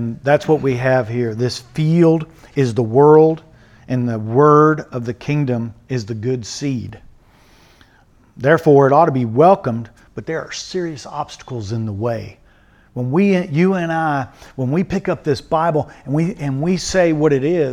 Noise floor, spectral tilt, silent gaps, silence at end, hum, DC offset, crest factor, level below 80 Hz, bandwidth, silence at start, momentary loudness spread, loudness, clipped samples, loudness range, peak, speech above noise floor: -51 dBFS; -7 dB/octave; none; 0 s; none; under 0.1%; 16 dB; -48 dBFS; 11.5 kHz; 0 s; 14 LU; -17 LUFS; under 0.1%; 9 LU; 0 dBFS; 35 dB